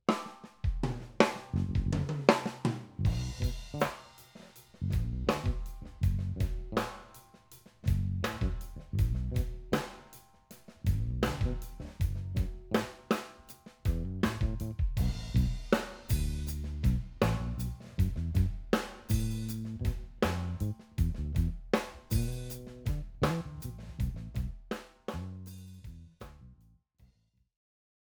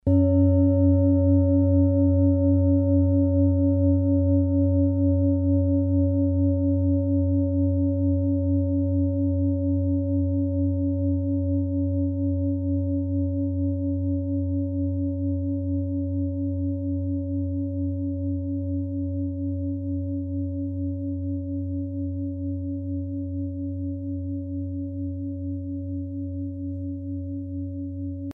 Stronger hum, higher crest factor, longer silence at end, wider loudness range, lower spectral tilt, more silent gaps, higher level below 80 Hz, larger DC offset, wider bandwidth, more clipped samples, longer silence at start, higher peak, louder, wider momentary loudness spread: neither; first, 30 dB vs 14 dB; first, 1.05 s vs 0 s; second, 6 LU vs 10 LU; second, -6.5 dB/octave vs -15 dB/octave; neither; about the same, -38 dBFS vs -42 dBFS; neither; first, over 20 kHz vs 1.4 kHz; neither; about the same, 0.1 s vs 0.05 s; first, -4 dBFS vs -10 dBFS; second, -34 LUFS vs -25 LUFS; first, 15 LU vs 11 LU